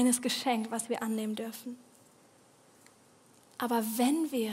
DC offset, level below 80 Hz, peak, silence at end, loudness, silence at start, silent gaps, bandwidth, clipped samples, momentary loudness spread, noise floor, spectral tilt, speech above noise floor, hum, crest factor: under 0.1%; -84 dBFS; -14 dBFS; 0 s; -32 LUFS; 0 s; none; 16 kHz; under 0.1%; 16 LU; -62 dBFS; -3 dB/octave; 31 dB; none; 20 dB